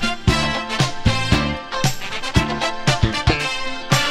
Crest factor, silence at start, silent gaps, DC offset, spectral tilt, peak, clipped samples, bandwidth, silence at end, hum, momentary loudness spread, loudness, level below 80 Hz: 18 dB; 0 s; none; under 0.1%; -4.5 dB/octave; 0 dBFS; under 0.1%; 16 kHz; 0 s; none; 4 LU; -20 LUFS; -30 dBFS